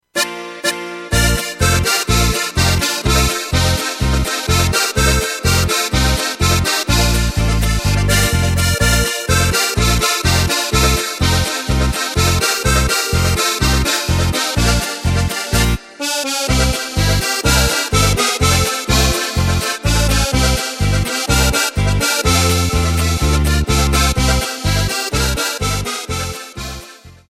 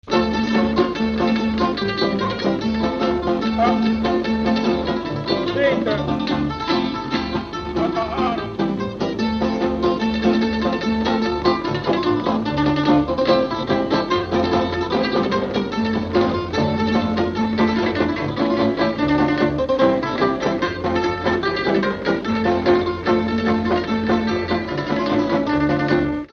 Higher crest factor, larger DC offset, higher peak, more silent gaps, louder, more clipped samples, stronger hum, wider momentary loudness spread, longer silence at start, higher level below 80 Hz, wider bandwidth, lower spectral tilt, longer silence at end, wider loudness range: about the same, 16 dB vs 16 dB; neither; first, 0 dBFS vs -4 dBFS; neither; first, -15 LUFS vs -20 LUFS; neither; neither; about the same, 4 LU vs 4 LU; about the same, 0.15 s vs 0.05 s; first, -22 dBFS vs -40 dBFS; first, 16.5 kHz vs 6.8 kHz; second, -3.5 dB/octave vs -6.5 dB/octave; about the same, 0.15 s vs 0.05 s; about the same, 2 LU vs 2 LU